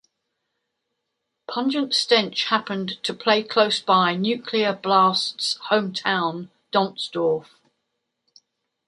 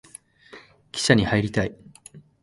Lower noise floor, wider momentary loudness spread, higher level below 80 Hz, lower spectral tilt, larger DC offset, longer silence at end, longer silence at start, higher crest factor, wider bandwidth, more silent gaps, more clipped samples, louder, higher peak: first, -79 dBFS vs -49 dBFS; second, 8 LU vs 12 LU; second, -74 dBFS vs -48 dBFS; about the same, -4 dB/octave vs -5 dB/octave; neither; first, 1.45 s vs 0.25 s; first, 1.5 s vs 0.55 s; about the same, 22 dB vs 24 dB; about the same, 11.5 kHz vs 11.5 kHz; neither; neither; about the same, -22 LUFS vs -22 LUFS; about the same, -2 dBFS vs -2 dBFS